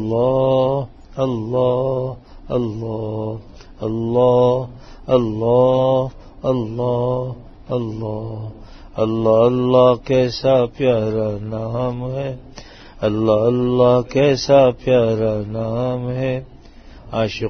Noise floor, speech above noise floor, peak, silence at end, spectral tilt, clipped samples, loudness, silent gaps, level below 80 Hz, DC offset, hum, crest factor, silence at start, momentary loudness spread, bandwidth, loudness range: -40 dBFS; 23 dB; -2 dBFS; 0 s; -7.5 dB/octave; under 0.1%; -18 LUFS; none; -42 dBFS; under 0.1%; none; 16 dB; 0 s; 14 LU; 6.6 kHz; 5 LU